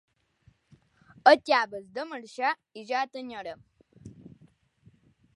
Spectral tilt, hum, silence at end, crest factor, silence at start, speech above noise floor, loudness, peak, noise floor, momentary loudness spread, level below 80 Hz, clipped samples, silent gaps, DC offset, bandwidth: -3.5 dB/octave; none; 1.05 s; 26 dB; 1.25 s; 37 dB; -27 LUFS; -4 dBFS; -65 dBFS; 23 LU; -72 dBFS; under 0.1%; none; under 0.1%; 11.5 kHz